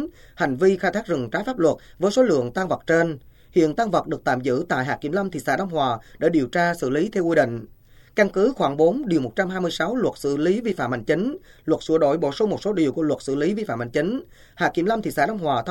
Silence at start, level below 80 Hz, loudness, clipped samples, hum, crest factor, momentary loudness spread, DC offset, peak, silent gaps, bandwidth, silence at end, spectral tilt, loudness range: 0 s; -52 dBFS; -22 LUFS; under 0.1%; none; 18 dB; 6 LU; under 0.1%; -4 dBFS; none; 17 kHz; 0 s; -6 dB/octave; 1 LU